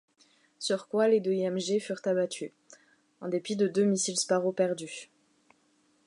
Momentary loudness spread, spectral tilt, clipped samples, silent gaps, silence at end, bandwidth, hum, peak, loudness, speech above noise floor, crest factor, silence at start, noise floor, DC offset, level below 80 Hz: 13 LU; -4.5 dB/octave; under 0.1%; none; 1.05 s; 11.5 kHz; none; -14 dBFS; -29 LUFS; 40 dB; 16 dB; 0.6 s; -69 dBFS; under 0.1%; -82 dBFS